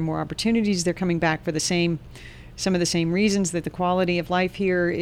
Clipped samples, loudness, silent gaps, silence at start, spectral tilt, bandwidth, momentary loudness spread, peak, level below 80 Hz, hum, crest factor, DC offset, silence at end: under 0.1%; -23 LUFS; none; 0 s; -5 dB/octave; 15.5 kHz; 6 LU; -8 dBFS; -46 dBFS; none; 14 dB; under 0.1%; 0 s